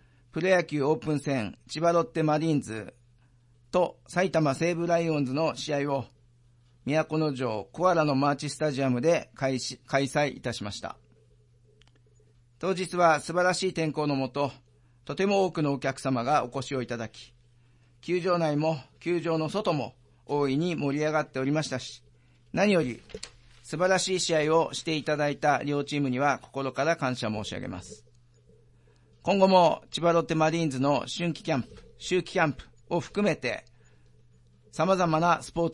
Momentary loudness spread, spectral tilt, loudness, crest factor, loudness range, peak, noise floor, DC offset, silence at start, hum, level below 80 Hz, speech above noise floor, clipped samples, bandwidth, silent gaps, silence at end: 12 LU; -5.5 dB/octave; -27 LUFS; 20 dB; 4 LU; -8 dBFS; -61 dBFS; under 0.1%; 0.35 s; none; -62 dBFS; 34 dB; under 0.1%; 11.5 kHz; none; 0 s